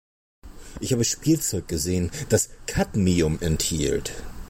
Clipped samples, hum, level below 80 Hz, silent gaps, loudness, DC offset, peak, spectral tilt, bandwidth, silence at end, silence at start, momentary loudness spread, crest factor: under 0.1%; none; -38 dBFS; none; -24 LUFS; under 0.1%; -8 dBFS; -4.5 dB/octave; 16.5 kHz; 0 s; 0.45 s; 6 LU; 18 dB